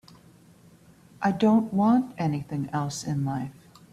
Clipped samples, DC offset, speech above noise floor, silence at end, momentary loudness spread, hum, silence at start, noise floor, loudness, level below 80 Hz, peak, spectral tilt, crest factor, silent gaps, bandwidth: under 0.1%; under 0.1%; 30 dB; 0.4 s; 9 LU; none; 1.2 s; -54 dBFS; -26 LUFS; -62 dBFS; -10 dBFS; -7 dB/octave; 16 dB; none; 13 kHz